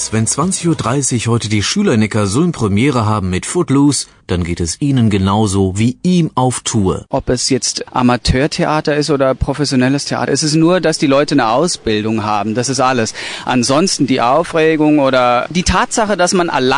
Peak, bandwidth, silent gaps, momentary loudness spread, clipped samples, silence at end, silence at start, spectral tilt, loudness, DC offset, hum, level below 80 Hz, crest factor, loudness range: 0 dBFS; 10.5 kHz; none; 5 LU; under 0.1%; 0 s; 0 s; -5 dB/octave; -14 LUFS; under 0.1%; none; -34 dBFS; 14 dB; 2 LU